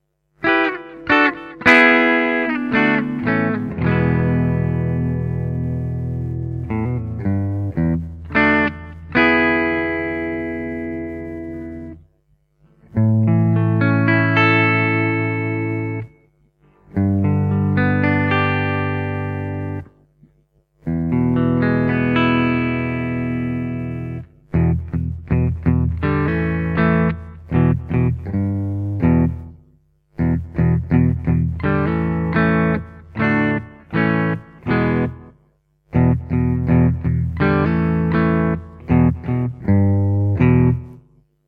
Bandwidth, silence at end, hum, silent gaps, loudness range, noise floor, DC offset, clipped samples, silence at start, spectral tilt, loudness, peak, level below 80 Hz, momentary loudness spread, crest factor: 6.4 kHz; 0.5 s; none; none; 5 LU; -61 dBFS; under 0.1%; under 0.1%; 0.4 s; -9 dB/octave; -18 LUFS; 0 dBFS; -36 dBFS; 11 LU; 18 dB